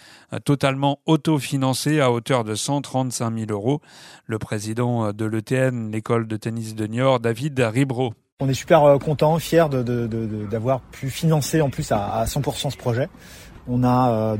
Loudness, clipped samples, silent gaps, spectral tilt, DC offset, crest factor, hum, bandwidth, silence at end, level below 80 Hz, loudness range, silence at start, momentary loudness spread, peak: -22 LUFS; under 0.1%; 8.32-8.37 s; -6 dB/octave; under 0.1%; 20 dB; none; 16 kHz; 0 s; -48 dBFS; 5 LU; 0.3 s; 10 LU; -2 dBFS